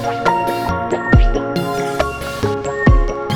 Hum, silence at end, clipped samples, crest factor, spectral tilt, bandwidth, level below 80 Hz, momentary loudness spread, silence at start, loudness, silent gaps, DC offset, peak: none; 0 s; under 0.1%; 16 dB; -6.5 dB/octave; 18 kHz; -20 dBFS; 6 LU; 0 s; -17 LUFS; none; under 0.1%; 0 dBFS